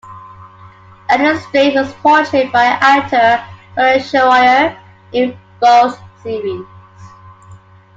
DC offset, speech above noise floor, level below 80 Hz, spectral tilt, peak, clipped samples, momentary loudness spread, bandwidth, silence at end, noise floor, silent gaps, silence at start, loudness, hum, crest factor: under 0.1%; 28 dB; -54 dBFS; -4.5 dB/octave; 0 dBFS; under 0.1%; 13 LU; 7.8 kHz; 0.4 s; -40 dBFS; none; 0.05 s; -12 LUFS; none; 14 dB